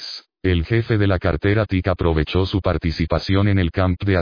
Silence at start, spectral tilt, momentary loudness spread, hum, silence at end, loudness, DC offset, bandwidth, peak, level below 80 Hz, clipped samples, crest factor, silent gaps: 0 s; -8 dB/octave; 4 LU; none; 0 s; -20 LUFS; under 0.1%; 5.2 kHz; -4 dBFS; -32 dBFS; under 0.1%; 16 dB; none